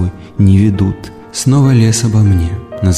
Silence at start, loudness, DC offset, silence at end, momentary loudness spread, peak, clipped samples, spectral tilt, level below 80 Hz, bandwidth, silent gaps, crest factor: 0 s; -12 LUFS; under 0.1%; 0 s; 11 LU; -2 dBFS; under 0.1%; -6.5 dB/octave; -30 dBFS; 13.5 kHz; none; 10 dB